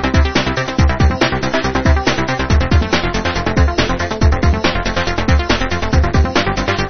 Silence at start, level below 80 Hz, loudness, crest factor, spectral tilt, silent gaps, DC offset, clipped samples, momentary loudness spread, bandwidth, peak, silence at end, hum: 0 s; -18 dBFS; -15 LUFS; 14 dB; -5.5 dB/octave; none; 4%; under 0.1%; 3 LU; 6.6 kHz; 0 dBFS; 0 s; none